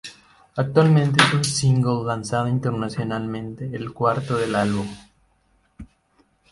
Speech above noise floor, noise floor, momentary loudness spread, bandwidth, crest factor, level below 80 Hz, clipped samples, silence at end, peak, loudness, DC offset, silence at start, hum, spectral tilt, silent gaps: 43 dB; -63 dBFS; 14 LU; 11.5 kHz; 22 dB; -52 dBFS; under 0.1%; 0.65 s; 0 dBFS; -21 LUFS; under 0.1%; 0.05 s; none; -5.5 dB/octave; none